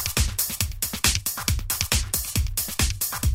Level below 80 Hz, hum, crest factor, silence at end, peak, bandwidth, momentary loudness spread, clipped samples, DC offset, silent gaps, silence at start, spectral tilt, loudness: -30 dBFS; none; 22 dB; 0 s; -2 dBFS; 16.5 kHz; 4 LU; under 0.1%; under 0.1%; none; 0 s; -2 dB/octave; -24 LUFS